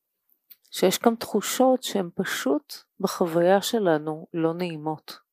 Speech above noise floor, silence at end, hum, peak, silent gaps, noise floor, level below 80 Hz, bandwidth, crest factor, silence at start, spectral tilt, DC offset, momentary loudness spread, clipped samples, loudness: 47 dB; 0.15 s; none; -4 dBFS; none; -71 dBFS; -76 dBFS; 15.5 kHz; 22 dB; 0.75 s; -4.5 dB/octave; under 0.1%; 11 LU; under 0.1%; -25 LUFS